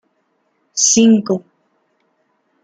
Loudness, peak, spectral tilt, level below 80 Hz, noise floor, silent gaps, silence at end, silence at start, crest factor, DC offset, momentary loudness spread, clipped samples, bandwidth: -13 LUFS; -2 dBFS; -3.5 dB/octave; -62 dBFS; -65 dBFS; none; 1.25 s; 0.75 s; 16 dB; under 0.1%; 13 LU; under 0.1%; 9.6 kHz